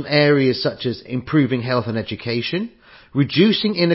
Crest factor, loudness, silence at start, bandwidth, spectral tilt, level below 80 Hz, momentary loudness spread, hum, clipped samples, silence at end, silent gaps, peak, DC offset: 18 dB; -19 LUFS; 0 s; 5.8 kHz; -10.5 dB/octave; -52 dBFS; 11 LU; none; under 0.1%; 0 s; none; -2 dBFS; under 0.1%